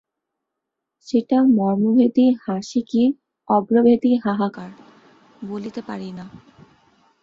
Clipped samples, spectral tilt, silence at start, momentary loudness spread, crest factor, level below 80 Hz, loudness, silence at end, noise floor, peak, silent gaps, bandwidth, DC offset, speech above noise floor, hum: under 0.1%; -7.5 dB/octave; 1.05 s; 18 LU; 16 dB; -64 dBFS; -19 LUFS; 0.85 s; -82 dBFS; -6 dBFS; none; 7.4 kHz; under 0.1%; 63 dB; none